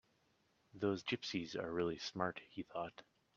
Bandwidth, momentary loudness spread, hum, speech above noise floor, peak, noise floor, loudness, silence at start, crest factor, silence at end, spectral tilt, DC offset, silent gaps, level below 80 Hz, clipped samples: 7.6 kHz; 9 LU; none; 35 dB; -22 dBFS; -77 dBFS; -42 LUFS; 0.75 s; 22 dB; 0.35 s; -5 dB/octave; under 0.1%; none; -76 dBFS; under 0.1%